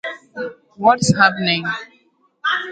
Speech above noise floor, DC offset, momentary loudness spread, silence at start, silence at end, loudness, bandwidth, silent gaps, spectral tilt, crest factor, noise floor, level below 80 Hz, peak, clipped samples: 43 dB; under 0.1%; 16 LU; 0.05 s; 0 s; -17 LUFS; 9.4 kHz; none; -4 dB/octave; 20 dB; -59 dBFS; -54 dBFS; 0 dBFS; under 0.1%